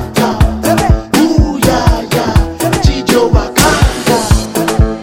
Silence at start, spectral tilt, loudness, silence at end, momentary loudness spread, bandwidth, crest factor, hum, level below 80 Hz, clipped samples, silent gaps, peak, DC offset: 0 s; -5 dB/octave; -11 LUFS; 0 s; 3 LU; 19 kHz; 10 dB; none; -16 dBFS; 0.7%; none; 0 dBFS; under 0.1%